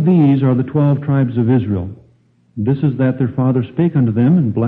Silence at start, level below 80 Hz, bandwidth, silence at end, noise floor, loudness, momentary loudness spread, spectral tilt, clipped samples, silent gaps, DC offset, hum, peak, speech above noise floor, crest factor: 0 s; -50 dBFS; 4 kHz; 0 s; -53 dBFS; -15 LUFS; 9 LU; -12 dB/octave; under 0.1%; none; under 0.1%; none; -2 dBFS; 40 dB; 12 dB